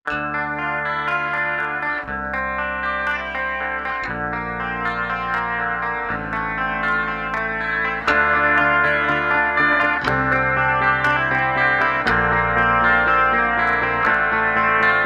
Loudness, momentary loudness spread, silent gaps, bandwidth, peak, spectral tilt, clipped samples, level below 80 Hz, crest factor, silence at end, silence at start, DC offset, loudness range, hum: -19 LUFS; 8 LU; none; 11.5 kHz; -4 dBFS; -6 dB/octave; under 0.1%; -40 dBFS; 16 dB; 0 s; 0.05 s; under 0.1%; 6 LU; none